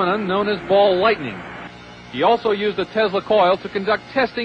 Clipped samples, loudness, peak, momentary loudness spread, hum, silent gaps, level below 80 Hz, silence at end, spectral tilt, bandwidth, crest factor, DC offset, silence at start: under 0.1%; -18 LUFS; -4 dBFS; 17 LU; none; none; -52 dBFS; 0 s; -6.5 dB/octave; 8.4 kHz; 14 dB; under 0.1%; 0 s